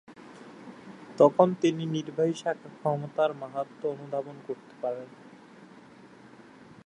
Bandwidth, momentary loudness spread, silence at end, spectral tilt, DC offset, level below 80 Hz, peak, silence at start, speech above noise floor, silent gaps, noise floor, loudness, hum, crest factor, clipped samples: 10.5 kHz; 24 LU; 1.2 s; -7 dB/octave; under 0.1%; -78 dBFS; -6 dBFS; 0.1 s; 24 dB; none; -52 dBFS; -28 LUFS; none; 24 dB; under 0.1%